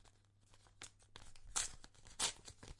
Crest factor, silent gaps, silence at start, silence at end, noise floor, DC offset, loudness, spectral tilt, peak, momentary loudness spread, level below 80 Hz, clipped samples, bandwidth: 30 dB; none; 0.05 s; 0 s; -69 dBFS; under 0.1%; -42 LUFS; 0 dB/octave; -20 dBFS; 20 LU; -62 dBFS; under 0.1%; 11.5 kHz